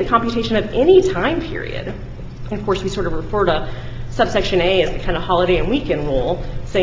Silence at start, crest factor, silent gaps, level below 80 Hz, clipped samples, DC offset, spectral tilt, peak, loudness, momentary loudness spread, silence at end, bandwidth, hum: 0 s; 16 dB; none; -30 dBFS; under 0.1%; under 0.1%; -6 dB/octave; -2 dBFS; -18 LUFS; 15 LU; 0 s; 7.6 kHz; none